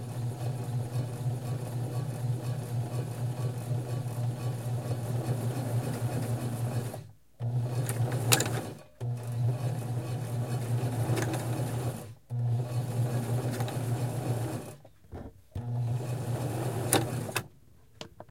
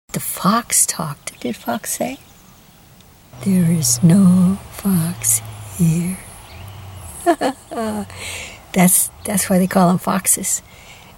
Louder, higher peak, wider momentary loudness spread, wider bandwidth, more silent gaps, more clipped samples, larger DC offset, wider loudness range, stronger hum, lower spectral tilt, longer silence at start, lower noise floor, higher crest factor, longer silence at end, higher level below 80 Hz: second, -33 LUFS vs -17 LUFS; about the same, -2 dBFS vs 0 dBFS; second, 9 LU vs 18 LU; second, 16.5 kHz vs over 20 kHz; neither; neither; neither; about the same, 3 LU vs 5 LU; neither; about the same, -5.5 dB/octave vs -4.5 dB/octave; second, 0 s vs 0.15 s; first, -59 dBFS vs -46 dBFS; first, 30 dB vs 18 dB; second, 0.05 s vs 0.25 s; second, -58 dBFS vs -48 dBFS